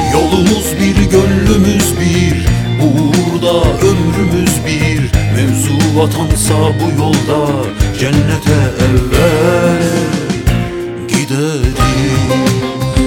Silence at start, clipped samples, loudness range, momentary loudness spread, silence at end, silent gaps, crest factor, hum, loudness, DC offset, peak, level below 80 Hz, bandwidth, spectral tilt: 0 s; under 0.1%; 2 LU; 5 LU; 0 s; none; 10 dB; none; -12 LUFS; under 0.1%; 0 dBFS; -22 dBFS; 17.5 kHz; -5.5 dB/octave